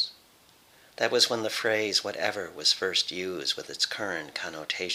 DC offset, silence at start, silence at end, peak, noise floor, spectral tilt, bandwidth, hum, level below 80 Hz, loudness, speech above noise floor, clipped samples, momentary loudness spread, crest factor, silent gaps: under 0.1%; 0 s; 0 s; -8 dBFS; -59 dBFS; -1.5 dB/octave; 16.5 kHz; none; -74 dBFS; -27 LUFS; 30 dB; under 0.1%; 9 LU; 22 dB; none